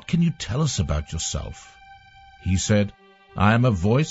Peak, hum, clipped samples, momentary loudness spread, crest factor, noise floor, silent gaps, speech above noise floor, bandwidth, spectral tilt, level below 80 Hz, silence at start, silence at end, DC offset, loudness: -4 dBFS; none; under 0.1%; 14 LU; 18 dB; -49 dBFS; none; 27 dB; 8 kHz; -5.5 dB/octave; -38 dBFS; 0.1 s; 0 s; under 0.1%; -23 LUFS